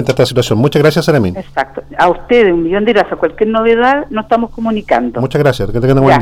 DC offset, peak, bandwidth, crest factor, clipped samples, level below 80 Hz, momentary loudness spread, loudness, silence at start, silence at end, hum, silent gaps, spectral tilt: under 0.1%; -2 dBFS; 16 kHz; 10 dB; under 0.1%; -32 dBFS; 7 LU; -12 LUFS; 0 s; 0 s; none; none; -6.5 dB/octave